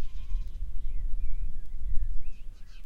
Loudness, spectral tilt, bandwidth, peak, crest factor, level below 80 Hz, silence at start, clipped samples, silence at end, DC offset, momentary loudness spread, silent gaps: -40 LUFS; -6.5 dB/octave; 2.6 kHz; -10 dBFS; 14 dB; -30 dBFS; 0 s; under 0.1%; 0 s; under 0.1%; 8 LU; none